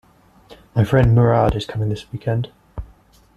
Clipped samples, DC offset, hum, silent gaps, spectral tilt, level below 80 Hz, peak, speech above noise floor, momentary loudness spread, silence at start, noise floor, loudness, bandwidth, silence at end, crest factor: under 0.1%; under 0.1%; none; none; -8.5 dB/octave; -36 dBFS; -2 dBFS; 34 dB; 21 LU; 0.5 s; -51 dBFS; -18 LUFS; 8.4 kHz; 0.5 s; 18 dB